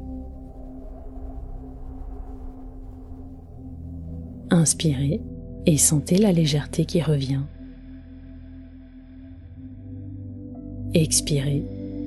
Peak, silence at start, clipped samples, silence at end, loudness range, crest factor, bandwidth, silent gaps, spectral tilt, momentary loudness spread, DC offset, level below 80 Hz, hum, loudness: -4 dBFS; 0 s; under 0.1%; 0 s; 19 LU; 22 dB; 12.5 kHz; none; -5 dB/octave; 24 LU; under 0.1%; -40 dBFS; none; -21 LUFS